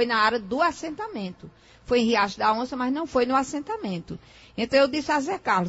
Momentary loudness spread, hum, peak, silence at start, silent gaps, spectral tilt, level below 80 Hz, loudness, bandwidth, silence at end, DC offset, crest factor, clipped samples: 13 LU; none; -6 dBFS; 0 s; none; -4.5 dB/octave; -54 dBFS; -25 LUFS; 8 kHz; 0 s; under 0.1%; 18 dB; under 0.1%